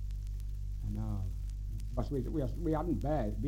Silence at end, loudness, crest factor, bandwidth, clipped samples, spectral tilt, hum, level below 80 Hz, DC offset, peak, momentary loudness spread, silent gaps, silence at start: 0 s; -37 LUFS; 14 dB; 10 kHz; under 0.1%; -9 dB/octave; 50 Hz at -40 dBFS; -38 dBFS; under 0.1%; -20 dBFS; 8 LU; none; 0 s